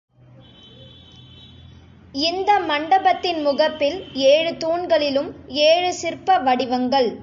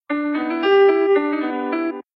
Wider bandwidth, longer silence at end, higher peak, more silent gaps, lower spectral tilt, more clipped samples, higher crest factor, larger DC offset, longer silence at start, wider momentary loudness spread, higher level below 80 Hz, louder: first, 7.6 kHz vs 5.8 kHz; second, 0 s vs 0.15 s; about the same, -6 dBFS vs -4 dBFS; neither; second, -3.5 dB/octave vs -6 dB/octave; neither; about the same, 16 dB vs 14 dB; neither; first, 0.8 s vs 0.1 s; about the same, 7 LU vs 9 LU; first, -54 dBFS vs -68 dBFS; about the same, -19 LUFS vs -18 LUFS